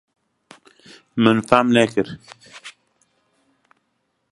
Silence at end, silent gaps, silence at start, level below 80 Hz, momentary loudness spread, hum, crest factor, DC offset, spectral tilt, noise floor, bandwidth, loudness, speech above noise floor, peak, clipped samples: 1.6 s; none; 1.15 s; -60 dBFS; 25 LU; none; 22 dB; under 0.1%; -5.5 dB/octave; -71 dBFS; 11.5 kHz; -18 LUFS; 54 dB; 0 dBFS; under 0.1%